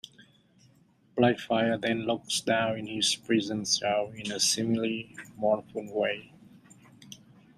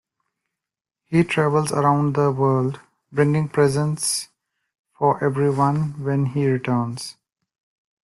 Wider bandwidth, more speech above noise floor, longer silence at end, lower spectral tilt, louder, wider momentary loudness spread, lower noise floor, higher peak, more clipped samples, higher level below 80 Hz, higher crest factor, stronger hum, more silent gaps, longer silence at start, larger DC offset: first, 15 kHz vs 12.5 kHz; second, 34 dB vs 67 dB; second, 0.4 s vs 0.95 s; second, -3 dB/octave vs -6 dB/octave; second, -28 LUFS vs -21 LUFS; first, 14 LU vs 9 LU; second, -63 dBFS vs -87 dBFS; second, -10 dBFS vs -4 dBFS; neither; second, -70 dBFS vs -58 dBFS; about the same, 20 dB vs 18 dB; neither; second, none vs 4.79-4.84 s; about the same, 1.15 s vs 1.1 s; neither